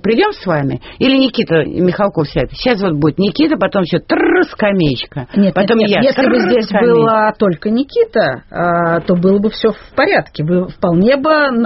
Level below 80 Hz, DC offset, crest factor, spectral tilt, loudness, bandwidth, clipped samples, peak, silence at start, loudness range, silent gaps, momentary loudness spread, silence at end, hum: -40 dBFS; under 0.1%; 12 dB; -5 dB/octave; -13 LUFS; 6 kHz; under 0.1%; 0 dBFS; 0.05 s; 2 LU; none; 5 LU; 0 s; none